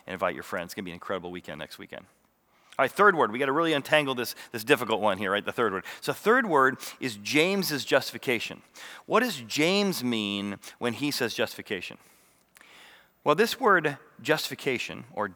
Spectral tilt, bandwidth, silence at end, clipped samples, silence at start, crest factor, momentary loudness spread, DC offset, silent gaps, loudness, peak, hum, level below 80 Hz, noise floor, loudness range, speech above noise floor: -4 dB/octave; over 20 kHz; 0 s; under 0.1%; 0.05 s; 22 dB; 15 LU; under 0.1%; none; -27 LUFS; -4 dBFS; none; -76 dBFS; -65 dBFS; 4 LU; 38 dB